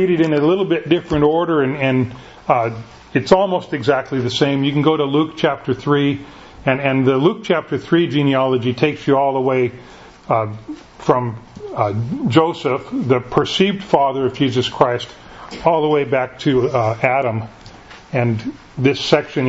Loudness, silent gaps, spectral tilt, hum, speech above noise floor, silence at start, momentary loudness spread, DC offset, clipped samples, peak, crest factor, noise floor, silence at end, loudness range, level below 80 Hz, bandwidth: -17 LUFS; none; -6.5 dB/octave; none; 23 dB; 0 s; 9 LU; under 0.1%; under 0.1%; 0 dBFS; 18 dB; -39 dBFS; 0 s; 2 LU; -48 dBFS; 8 kHz